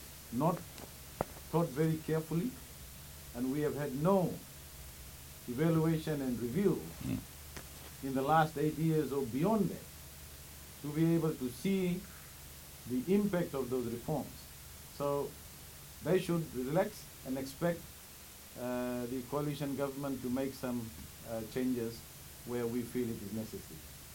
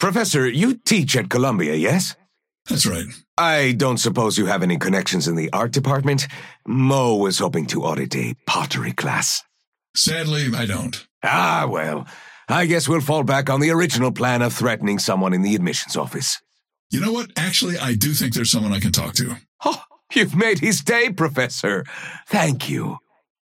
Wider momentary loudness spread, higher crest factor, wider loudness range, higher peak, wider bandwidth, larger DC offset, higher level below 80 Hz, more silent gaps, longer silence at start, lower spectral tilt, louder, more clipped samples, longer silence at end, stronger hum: first, 17 LU vs 8 LU; about the same, 20 dB vs 16 dB; about the same, 4 LU vs 2 LU; second, -16 dBFS vs -4 dBFS; about the same, 17 kHz vs 16.5 kHz; neither; about the same, -58 dBFS vs -56 dBFS; second, none vs 3.28-3.37 s, 9.67-9.72 s, 9.89-9.94 s, 11.11-11.21 s, 16.79-16.90 s, 19.48-19.59 s; about the same, 0 s vs 0 s; first, -6.5 dB/octave vs -4 dB/octave; second, -36 LUFS vs -20 LUFS; neither; second, 0 s vs 0.5 s; neither